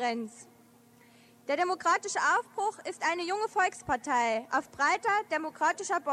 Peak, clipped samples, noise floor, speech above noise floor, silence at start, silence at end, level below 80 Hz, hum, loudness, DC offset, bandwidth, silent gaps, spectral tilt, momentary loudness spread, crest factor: -16 dBFS; under 0.1%; -59 dBFS; 29 dB; 0 s; 0 s; -68 dBFS; none; -30 LUFS; under 0.1%; 14.5 kHz; none; -2 dB/octave; 7 LU; 16 dB